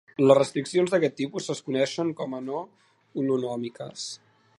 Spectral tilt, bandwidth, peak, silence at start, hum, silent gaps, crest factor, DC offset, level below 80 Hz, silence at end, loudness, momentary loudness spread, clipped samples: -5.5 dB/octave; 11.5 kHz; -4 dBFS; 0.2 s; none; none; 24 dB; under 0.1%; -76 dBFS; 0.4 s; -26 LUFS; 16 LU; under 0.1%